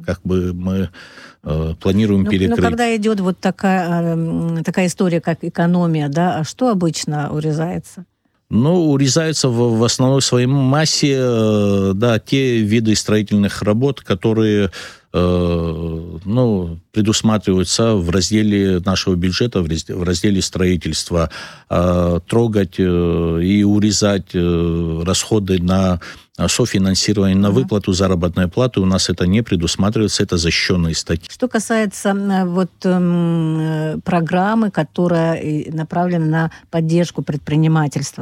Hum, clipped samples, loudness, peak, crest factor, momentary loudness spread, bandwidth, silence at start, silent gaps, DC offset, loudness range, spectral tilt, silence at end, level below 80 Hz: none; under 0.1%; -17 LUFS; -4 dBFS; 12 dB; 6 LU; 14.5 kHz; 0 s; none; under 0.1%; 3 LU; -5.5 dB/octave; 0 s; -38 dBFS